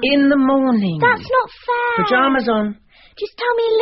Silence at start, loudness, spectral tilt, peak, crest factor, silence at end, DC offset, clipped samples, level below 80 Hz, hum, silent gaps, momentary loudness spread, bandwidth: 0 s; -16 LUFS; -3.5 dB/octave; -2 dBFS; 14 dB; 0 s; under 0.1%; under 0.1%; -50 dBFS; none; none; 8 LU; 5.8 kHz